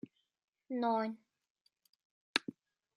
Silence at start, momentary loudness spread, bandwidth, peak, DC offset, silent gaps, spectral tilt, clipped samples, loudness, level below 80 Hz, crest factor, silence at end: 0.7 s; 19 LU; 11.5 kHz; -10 dBFS; under 0.1%; 1.50-1.55 s, 1.61-1.65 s, 1.89-1.93 s, 2.05-2.34 s; -3.5 dB/octave; under 0.1%; -37 LUFS; under -90 dBFS; 32 dB; 0.45 s